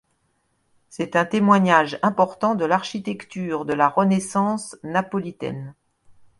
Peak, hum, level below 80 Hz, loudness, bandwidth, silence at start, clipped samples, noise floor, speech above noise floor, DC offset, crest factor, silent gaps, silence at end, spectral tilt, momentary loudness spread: -2 dBFS; none; -64 dBFS; -21 LUFS; 11.5 kHz; 0.95 s; under 0.1%; -69 dBFS; 48 dB; under 0.1%; 22 dB; none; 0.65 s; -6 dB/octave; 14 LU